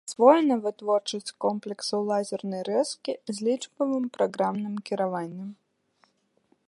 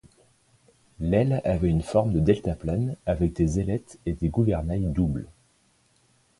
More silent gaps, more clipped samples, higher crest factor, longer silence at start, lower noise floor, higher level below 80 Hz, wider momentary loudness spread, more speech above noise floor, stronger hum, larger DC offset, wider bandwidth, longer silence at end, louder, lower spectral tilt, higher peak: neither; neither; about the same, 22 dB vs 18 dB; second, 0.05 s vs 1 s; about the same, -68 dBFS vs -65 dBFS; second, -82 dBFS vs -38 dBFS; first, 12 LU vs 8 LU; about the same, 42 dB vs 40 dB; neither; neither; about the same, 11.5 kHz vs 11.5 kHz; about the same, 1.15 s vs 1.1 s; about the same, -27 LUFS vs -26 LUFS; second, -5 dB/octave vs -8.5 dB/octave; first, -4 dBFS vs -8 dBFS